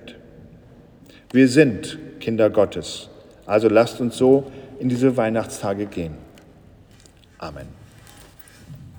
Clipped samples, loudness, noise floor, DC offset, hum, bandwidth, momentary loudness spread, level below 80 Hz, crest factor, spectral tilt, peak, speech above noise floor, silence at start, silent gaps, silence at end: under 0.1%; -20 LUFS; -50 dBFS; under 0.1%; none; over 20 kHz; 21 LU; -54 dBFS; 22 dB; -6 dB/octave; 0 dBFS; 31 dB; 0.05 s; none; 0.1 s